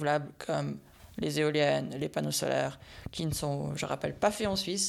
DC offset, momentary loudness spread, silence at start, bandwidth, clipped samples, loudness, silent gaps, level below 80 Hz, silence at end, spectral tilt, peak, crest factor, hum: under 0.1%; 10 LU; 0 s; 16 kHz; under 0.1%; -32 LUFS; none; -56 dBFS; 0 s; -4 dB/octave; -12 dBFS; 18 dB; none